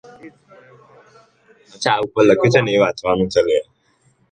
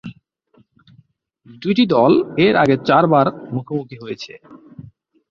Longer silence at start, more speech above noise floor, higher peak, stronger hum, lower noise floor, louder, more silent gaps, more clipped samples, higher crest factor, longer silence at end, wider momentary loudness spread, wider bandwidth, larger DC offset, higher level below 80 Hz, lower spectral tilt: first, 0.25 s vs 0.05 s; about the same, 44 dB vs 41 dB; about the same, 0 dBFS vs -2 dBFS; neither; about the same, -60 dBFS vs -57 dBFS; about the same, -16 LUFS vs -16 LUFS; neither; neither; about the same, 18 dB vs 16 dB; first, 0.7 s vs 0.5 s; second, 6 LU vs 17 LU; first, 9.2 kHz vs 7.2 kHz; neither; about the same, -52 dBFS vs -56 dBFS; second, -5.5 dB/octave vs -7.5 dB/octave